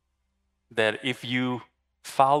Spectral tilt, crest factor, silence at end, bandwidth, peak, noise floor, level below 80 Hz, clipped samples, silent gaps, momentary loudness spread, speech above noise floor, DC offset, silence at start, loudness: -5 dB/octave; 22 dB; 0 s; 15 kHz; -6 dBFS; -75 dBFS; -72 dBFS; under 0.1%; none; 11 LU; 51 dB; under 0.1%; 0.75 s; -27 LUFS